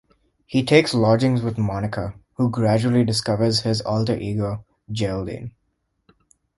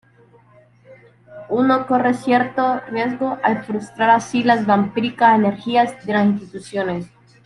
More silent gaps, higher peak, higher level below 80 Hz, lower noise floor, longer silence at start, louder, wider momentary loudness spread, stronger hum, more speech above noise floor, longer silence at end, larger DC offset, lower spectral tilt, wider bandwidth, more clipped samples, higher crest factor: neither; about the same, 0 dBFS vs -2 dBFS; first, -48 dBFS vs -60 dBFS; first, -72 dBFS vs -51 dBFS; second, 0.5 s vs 0.9 s; second, -21 LUFS vs -18 LUFS; first, 14 LU vs 9 LU; neither; first, 51 dB vs 33 dB; first, 1.1 s vs 0.4 s; neither; about the same, -6 dB/octave vs -6 dB/octave; about the same, 11.5 kHz vs 11.5 kHz; neither; about the same, 20 dB vs 18 dB